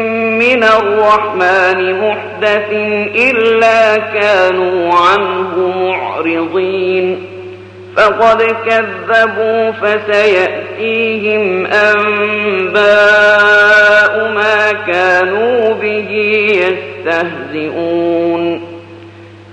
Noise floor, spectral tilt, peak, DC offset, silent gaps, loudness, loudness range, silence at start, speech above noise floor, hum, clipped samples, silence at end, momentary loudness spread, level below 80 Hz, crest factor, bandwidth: -34 dBFS; -4.5 dB/octave; 0 dBFS; under 0.1%; none; -11 LUFS; 5 LU; 0 s; 23 dB; none; under 0.1%; 0 s; 9 LU; -54 dBFS; 10 dB; 9.4 kHz